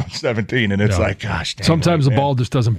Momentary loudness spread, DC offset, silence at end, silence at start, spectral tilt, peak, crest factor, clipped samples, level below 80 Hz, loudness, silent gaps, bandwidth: 6 LU; under 0.1%; 0 s; 0 s; -6 dB/octave; -4 dBFS; 14 dB; under 0.1%; -38 dBFS; -18 LUFS; none; 13.5 kHz